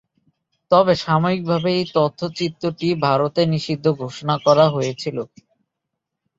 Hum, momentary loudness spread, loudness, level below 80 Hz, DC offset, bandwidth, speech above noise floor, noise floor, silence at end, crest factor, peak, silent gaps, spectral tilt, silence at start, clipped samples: none; 9 LU; -19 LUFS; -58 dBFS; under 0.1%; 7.8 kHz; 61 dB; -80 dBFS; 1.15 s; 18 dB; -2 dBFS; none; -6.5 dB/octave; 0.7 s; under 0.1%